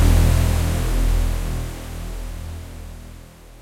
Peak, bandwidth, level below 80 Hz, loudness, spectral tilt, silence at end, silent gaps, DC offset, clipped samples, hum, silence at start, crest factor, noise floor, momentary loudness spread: -4 dBFS; 16.5 kHz; -22 dBFS; -23 LUFS; -5.5 dB/octave; 0 s; none; under 0.1%; under 0.1%; none; 0 s; 16 dB; -41 dBFS; 21 LU